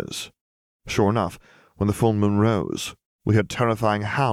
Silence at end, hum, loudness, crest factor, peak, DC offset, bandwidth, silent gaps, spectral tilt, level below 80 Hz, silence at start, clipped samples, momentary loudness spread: 0 s; none; -23 LUFS; 18 dB; -6 dBFS; under 0.1%; 15 kHz; 0.41-0.80 s, 3.05-3.19 s; -6 dB/octave; -50 dBFS; 0 s; under 0.1%; 12 LU